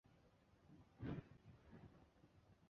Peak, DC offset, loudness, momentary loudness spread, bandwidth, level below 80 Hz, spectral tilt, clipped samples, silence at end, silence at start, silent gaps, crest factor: -36 dBFS; under 0.1%; -57 LUFS; 16 LU; 6.8 kHz; -72 dBFS; -7.5 dB/octave; under 0.1%; 0 s; 0.05 s; none; 22 dB